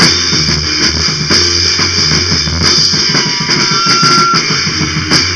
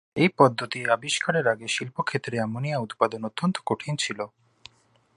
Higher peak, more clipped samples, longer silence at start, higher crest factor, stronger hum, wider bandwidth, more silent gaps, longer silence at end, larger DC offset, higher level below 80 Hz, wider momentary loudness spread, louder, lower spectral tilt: first, 0 dBFS vs -4 dBFS; first, 0.3% vs under 0.1%; second, 0 s vs 0.15 s; second, 10 dB vs 22 dB; neither; about the same, 11 kHz vs 11.5 kHz; neither; second, 0 s vs 0.9 s; first, 0.5% vs under 0.1%; first, -30 dBFS vs -68 dBFS; second, 4 LU vs 8 LU; first, -8 LUFS vs -25 LUFS; second, -2 dB/octave vs -4.5 dB/octave